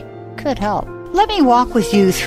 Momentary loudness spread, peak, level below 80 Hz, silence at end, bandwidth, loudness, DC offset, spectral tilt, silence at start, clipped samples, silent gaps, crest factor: 11 LU; -2 dBFS; -34 dBFS; 0 s; 16 kHz; -16 LUFS; under 0.1%; -5 dB/octave; 0 s; under 0.1%; none; 14 dB